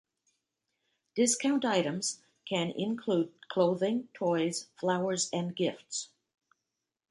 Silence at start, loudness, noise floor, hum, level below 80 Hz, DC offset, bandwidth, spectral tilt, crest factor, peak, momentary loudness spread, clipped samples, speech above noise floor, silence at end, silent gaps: 1.15 s; -31 LUFS; -87 dBFS; none; -78 dBFS; under 0.1%; 11.5 kHz; -4 dB/octave; 20 dB; -14 dBFS; 9 LU; under 0.1%; 56 dB; 1.05 s; none